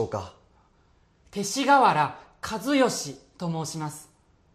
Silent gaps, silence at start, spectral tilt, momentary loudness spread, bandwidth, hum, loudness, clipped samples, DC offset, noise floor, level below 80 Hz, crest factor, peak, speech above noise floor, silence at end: none; 0 s; -4 dB/octave; 19 LU; 14.5 kHz; none; -25 LUFS; under 0.1%; under 0.1%; -62 dBFS; -62 dBFS; 20 dB; -8 dBFS; 37 dB; 0.5 s